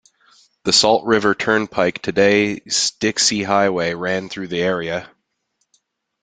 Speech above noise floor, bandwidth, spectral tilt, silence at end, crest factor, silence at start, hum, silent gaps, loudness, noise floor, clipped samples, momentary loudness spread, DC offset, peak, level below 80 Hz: 53 dB; 9.6 kHz; -3 dB/octave; 1.15 s; 20 dB; 0.65 s; none; none; -18 LUFS; -71 dBFS; under 0.1%; 9 LU; under 0.1%; 0 dBFS; -56 dBFS